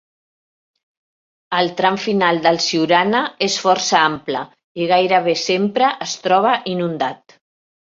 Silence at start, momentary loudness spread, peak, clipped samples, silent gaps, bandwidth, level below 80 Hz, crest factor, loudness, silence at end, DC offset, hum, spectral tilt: 1.5 s; 9 LU; -2 dBFS; under 0.1%; 4.64-4.75 s; 7.8 kHz; -64 dBFS; 18 dB; -17 LUFS; 0.7 s; under 0.1%; none; -3.5 dB/octave